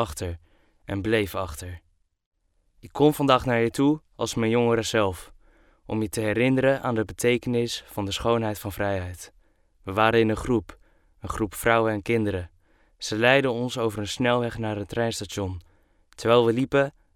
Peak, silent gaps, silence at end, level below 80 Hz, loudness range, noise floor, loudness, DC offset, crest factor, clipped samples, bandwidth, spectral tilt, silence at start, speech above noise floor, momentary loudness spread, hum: -4 dBFS; 2.26-2.32 s; 0.25 s; -50 dBFS; 3 LU; -65 dBFS; -24 LUFS; under 0.1%; 22 dB; under 0.1%; 17.5 kHz; -5.5 dB/octave; 0 s; 41 dB; 15 LU; none